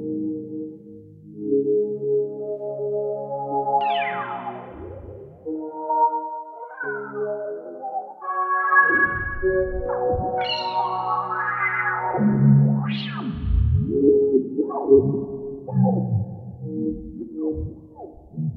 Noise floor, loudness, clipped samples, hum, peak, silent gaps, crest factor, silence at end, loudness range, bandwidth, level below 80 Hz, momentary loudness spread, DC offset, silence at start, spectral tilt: -43 dBFS; -23 LUFS; under 0.1%; none; -4 dBFS; none; 20 dB; 0 s; 7 LU; 4.9 kHz; -38 dBFS; 17 LU; under 0.1%; 0 s; -9.5 dB/octave